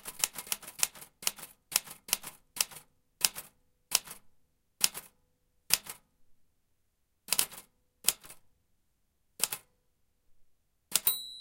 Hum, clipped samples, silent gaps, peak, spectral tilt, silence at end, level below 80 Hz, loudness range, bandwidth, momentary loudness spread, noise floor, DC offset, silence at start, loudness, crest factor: none; under 0.1%; none; -4 dBFS; 1.5 dB/octave; 0 s; -68 dBFS; 3 LU; 17 kHz; 16 LU; -75 dBFS; under 0.1%; 0.05 s; -32 LUFS; 34 dB